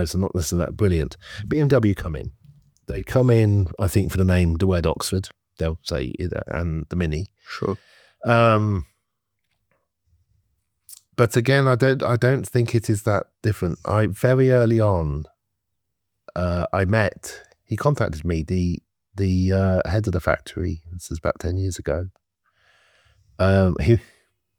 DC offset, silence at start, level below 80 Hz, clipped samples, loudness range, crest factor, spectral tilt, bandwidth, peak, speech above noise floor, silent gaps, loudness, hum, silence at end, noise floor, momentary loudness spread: under 0.1%; 0 s; -38 dBFS; under 0.1%; 5 LU; 20 dB; -7 dB/octave; 17.5 kHz; -2 dBFS; 59 dB; none; -22 LUFS; none; 0.55 s; -80 dBFS; 15 LU